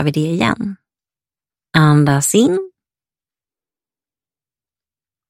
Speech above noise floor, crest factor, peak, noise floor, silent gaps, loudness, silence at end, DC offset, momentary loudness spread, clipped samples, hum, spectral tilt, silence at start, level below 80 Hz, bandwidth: over 76 dB; 18 dB; 0 dBFS; under -90 dBFS; none; -15 LUFS; 2.6 s; under 0.1%; 12 LU; under 0.1%; none; -5.5 dB/octave; 0 s; -54 dBFS; 16 kHz